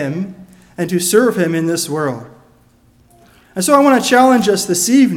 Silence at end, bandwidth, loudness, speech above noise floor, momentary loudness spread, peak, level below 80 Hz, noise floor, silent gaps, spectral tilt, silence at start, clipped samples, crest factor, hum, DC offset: 0 s; 17.5 kHz; -13 LUFS; 38 dB; 14 LU; 0 dBFS; -56 dBFS; -51 dBFS; none; -4 dB/octave; 0 s; under 0.1%; 14 dB; none; under 0.1%